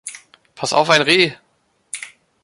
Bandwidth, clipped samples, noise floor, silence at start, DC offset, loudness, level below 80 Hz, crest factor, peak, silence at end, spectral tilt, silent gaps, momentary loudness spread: 11.5 kHz; under 0.1%; -43 dBFS; 0.05 s; under 0.1%; -15 LUFS; -62 dBFS; 20 dB; 0 dBFS; 0.35 s; -3 dB/octave; none; 20 LU